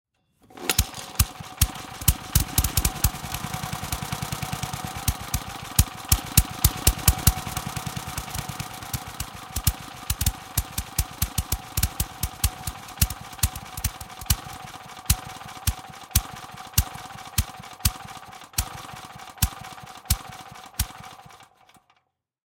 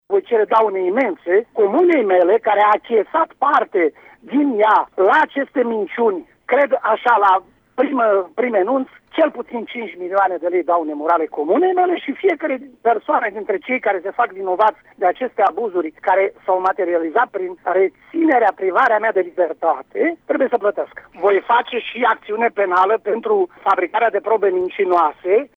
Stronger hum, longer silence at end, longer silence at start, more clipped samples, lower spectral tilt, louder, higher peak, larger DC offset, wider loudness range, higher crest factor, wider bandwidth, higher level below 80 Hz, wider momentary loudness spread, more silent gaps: neither; first, 1.1 s vs 0.1 s; first, 0.5 s vs 0.1 s; neither; second, -3 dB/octave vs -6.5 dB/octave; second, -26 LUFS vs -17 LUFS; first, 0 dBFS vs -4 dBFS; neither; first, 7 LU vs 3 LU; first, 28 dB vs 12 dB; first, 17 kHz vs 6 kHz; first, -32 dBFS vs -66 dBFS; first, 16 LU vs 7 LU; neither